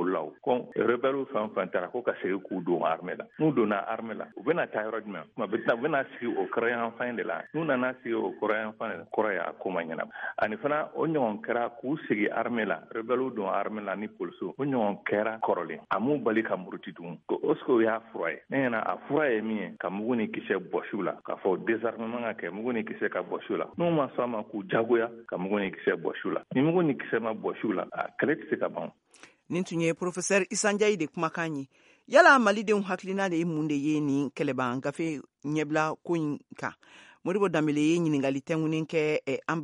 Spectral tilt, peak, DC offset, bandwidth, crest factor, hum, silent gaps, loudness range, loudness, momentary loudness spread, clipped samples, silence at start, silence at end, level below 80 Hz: -5.5 dB/octave; -6 dBFS; under 0.1%; 11 kHz; 24 dB; none; none; 6 LU; -29 LUFS; 9 LU; under 0.1%; 0 s; 0 s; -76 dBFS